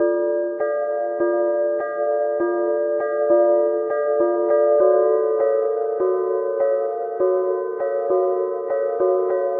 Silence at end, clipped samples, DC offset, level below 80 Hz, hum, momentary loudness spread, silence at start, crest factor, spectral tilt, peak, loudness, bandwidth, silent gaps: 0 s; under 0.1%; under 0.1%; -70 dBFS; none; 7 LU; 0 s; 14 dB; -10 dB/octave; -6 dBFS; -20 LUFS; 2.3 kHz; none